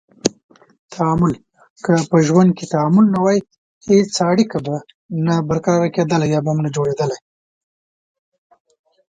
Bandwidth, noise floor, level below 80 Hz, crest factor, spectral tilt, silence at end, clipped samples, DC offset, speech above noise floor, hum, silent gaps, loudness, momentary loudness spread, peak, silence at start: 9.4 kHz; under -90 dBFS; -52 dBFS; 18 dB; -6.5 dB/octave; 2 s; under 0.1%; under 0.1%; over 74 dB; none; 0.43-0.49 s, 0.79-0.89 s, 1.70-1.76 s, 3.58-3.81 s, 4.94-5.09 s; -17 LUFS; 13 LU; 0 dBFS; 0.25 s